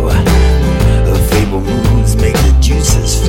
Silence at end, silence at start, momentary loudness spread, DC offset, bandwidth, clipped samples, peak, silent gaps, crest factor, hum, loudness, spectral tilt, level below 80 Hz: 0 s; 0 s; 2 LU; under 0.1%; 17 kHz; under 0.1%; 0 dBFS; none; 10 dB; none; -11 LUFS; -5.5 dB/octave; -12 dBFS